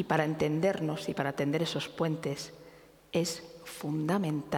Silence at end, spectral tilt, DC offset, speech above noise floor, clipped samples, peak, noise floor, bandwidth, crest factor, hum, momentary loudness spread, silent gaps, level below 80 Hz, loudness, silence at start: 0 s; -5.5 dB/octave; under 0.1%; 24 dB; under 0.1%; -10 dBFS; -56 dBFS; 18.5 kHz; 22 dB; none; 11 LU; none; -66 dBFS; -32 LUFS; 0 s